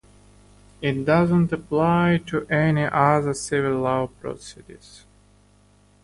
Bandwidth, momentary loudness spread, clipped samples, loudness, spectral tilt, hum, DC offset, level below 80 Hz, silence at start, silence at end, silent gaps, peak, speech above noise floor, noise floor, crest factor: 11.5 kHz; 12 LU; under 0.1%; -21 LUFS; -6.5 dB/octave; 50 Hz at -40 dBFS; under 0.1%; -50 dBFS; 0.8 s; 1.1 s; none; -4 dBFS; 35 dB; -56 dBFS; 18 dB